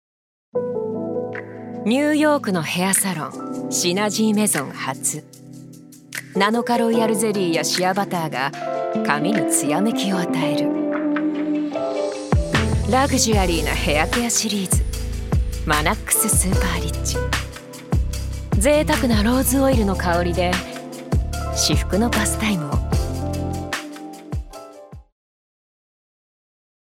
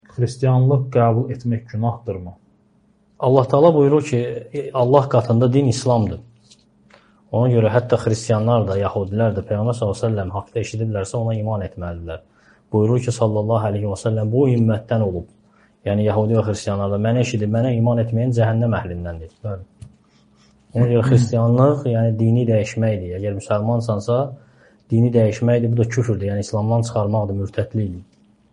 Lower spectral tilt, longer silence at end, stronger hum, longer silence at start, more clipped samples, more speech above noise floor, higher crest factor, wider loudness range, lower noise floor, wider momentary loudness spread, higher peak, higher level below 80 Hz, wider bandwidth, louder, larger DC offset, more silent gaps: second, -4 dB/octave vs -8 dB/octave; first, 1.8 s vs 0.5 s; neither; first, 0.55 s vs 0.15 s; neither; second, 23 dB vs 40 dB; about the same, 20 dB vs 18 dB; about the same, 3 LU vs 4 LU; second, -42 dBFS vs -58 dBFS; about the same, 11 LU vs 12 LU; about the same, 0 dBFS vs 0 dBFS; first, -30 dBFS vs -50 dBFS; first, 17 kHz vs 10 kHz; about the same, -20 LUFS vs -19 LUFS; neither; neither